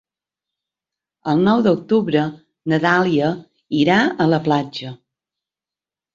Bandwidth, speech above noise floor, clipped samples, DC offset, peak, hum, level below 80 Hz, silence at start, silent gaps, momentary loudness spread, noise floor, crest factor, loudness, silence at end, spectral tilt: 7.6 kHz; 73 dB; under 0.1%; under 0.1%; -2 dBFS; none; -60 dBFS; 1.25 s; none; 15 LU; -90 dBFS; 18 dB; -18 LUFS; 1.2 s; -7 dB/octave